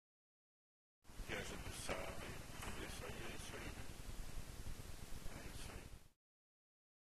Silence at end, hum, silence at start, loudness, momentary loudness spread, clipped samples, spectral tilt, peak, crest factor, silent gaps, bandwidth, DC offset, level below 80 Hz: 1.05 s; none; 1.05 s; -51 LUFS; 8 LU; under 0.1%; -3.5 dB/octave; -30 dBFS; 20 dB; none; 15 kHz; under 0.1%; -56 dBFS